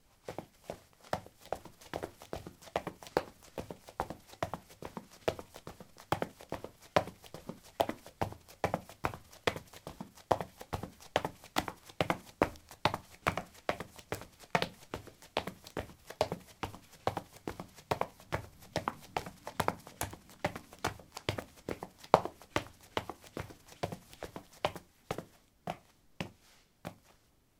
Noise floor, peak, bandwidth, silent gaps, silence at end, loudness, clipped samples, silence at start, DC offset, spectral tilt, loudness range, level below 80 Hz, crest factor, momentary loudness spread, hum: -67 dBFS; -2 dBFS; 17.5 kHz; none; 0.65 s; -39 LUFS; under 0.1%; 0.25 s; under 0.1%; -4.5 dB/octave; 6 LU; -60 dBFS; 38 dB; 13 LU; none